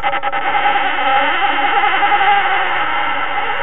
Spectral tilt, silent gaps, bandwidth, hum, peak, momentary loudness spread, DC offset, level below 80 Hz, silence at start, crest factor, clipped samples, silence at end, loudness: -6 dB/octave; none; 4.1 kHz; none; 0 dBFS; 5 LU; 8%; -50 dBFS; 0 s; 14 dB; under 0.1%; 0 s; -14 LUFS